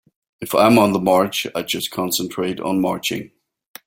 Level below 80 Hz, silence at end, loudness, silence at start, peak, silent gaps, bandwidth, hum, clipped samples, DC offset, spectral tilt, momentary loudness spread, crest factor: -56 dBFS; 0.6 s; -19 LUFS; 0.4 s; -2 dBFS; none; 17 kHz; none; under 0.1%; under 0.1%; -4.5 dB/octave; 10 LU; 18 dB